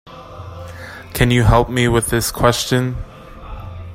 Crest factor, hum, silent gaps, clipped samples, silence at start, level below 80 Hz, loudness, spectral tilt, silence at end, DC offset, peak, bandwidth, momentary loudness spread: 18 dB; none; none; under 0.1%; 0.05 s; -30 dBFS; -16 LUFS; -5 dB/octave; 0 s; under 0.1%; 0 dBFS; 16.5 kHz; 21 LU